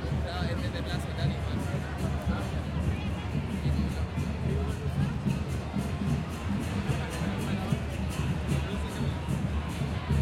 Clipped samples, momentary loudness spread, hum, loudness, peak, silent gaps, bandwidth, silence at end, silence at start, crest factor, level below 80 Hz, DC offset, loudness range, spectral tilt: under 0.1%; 3 LU; none; -32 LUFS; -14 dBFS; none; 15 kHz; 0 s; 0 s; 16 dB; -38 dBFS; under 0.1%; 0 LU; -6.5 dB/octave